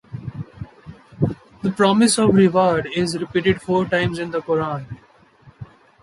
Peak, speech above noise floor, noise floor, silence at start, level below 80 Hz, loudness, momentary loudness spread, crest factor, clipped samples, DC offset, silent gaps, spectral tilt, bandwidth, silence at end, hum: -2 dBFS; 34 dB; -52 dBFS; 0.1 s; -48 dBFS; -19 LUFS; 20 LU; 18 dB; under 0.1%; under 0.1%; none; -5.5 dB/octave; 11.5 kHz; 0.4 s; none